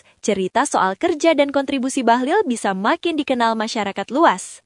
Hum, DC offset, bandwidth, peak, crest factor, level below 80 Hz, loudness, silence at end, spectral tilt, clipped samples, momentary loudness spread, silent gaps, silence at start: none; under 0.1%; 11 kHz; 0 dBFS; 18 dB; -64 dBFS; -19 LUFS; 0.1 s; -4 dB/octave; under 0.1%; 5 LU; none; 0.25 s